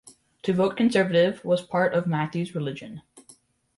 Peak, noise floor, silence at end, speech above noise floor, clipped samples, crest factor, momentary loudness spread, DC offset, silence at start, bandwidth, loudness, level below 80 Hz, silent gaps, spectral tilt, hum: -10 dBFS; -57 dBFS; 0.55 s; 33 dB; under 0.1%; 16 dB; 13 LU; under 0.1%; 0.05 s; 11.5 kHz; -24 LUFS; -66 dBFS; none; -6.5 dB/octave; none